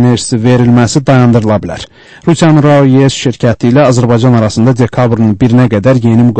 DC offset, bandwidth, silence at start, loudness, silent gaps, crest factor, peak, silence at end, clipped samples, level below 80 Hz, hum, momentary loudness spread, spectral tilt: under 0.1%; 8.8 kHz; 0 s; -8 LUFS; none; 8 dB; 0 dBFS; 0 s; 1%; -36 dBFS; none; 7 LU; -7 dB/octave